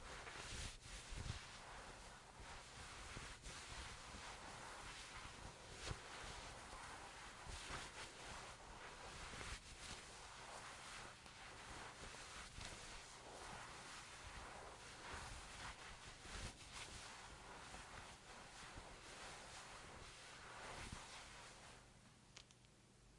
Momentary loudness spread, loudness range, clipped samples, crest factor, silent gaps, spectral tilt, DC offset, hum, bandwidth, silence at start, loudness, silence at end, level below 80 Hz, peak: 6 LU; 3 LU; under 0.1%; 24 dB; none; -2.5 dB/octave; under 0.1%; none; 11.5 kHz; 0 s; -55 LUFS; 0 s; -64 dBFS; -32 dBFS